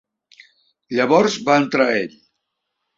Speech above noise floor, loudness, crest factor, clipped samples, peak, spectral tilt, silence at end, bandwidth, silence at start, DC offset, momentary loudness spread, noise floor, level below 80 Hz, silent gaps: 60 dB; -17 LUFS; 18 dB; under 0.1%; -2 dBFS; -4.5 dB/octave; 0.9 s; 7.8 kHz; 0.9 s; under 0.1%; 9 LU; -77 dBFS; -64 dBFS; none